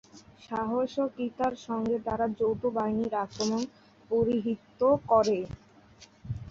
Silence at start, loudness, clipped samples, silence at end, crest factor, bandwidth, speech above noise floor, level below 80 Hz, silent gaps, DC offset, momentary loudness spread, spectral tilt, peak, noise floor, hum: 0.15 s; -29 LUFS; under 0.1%; 0 s; 18 dB; 7.8 kHz; 27 dB; -56 dBFS; none; under 0.1%; 14 LU; -6 dB/octave; -12 dBFS; -56 dBFS; none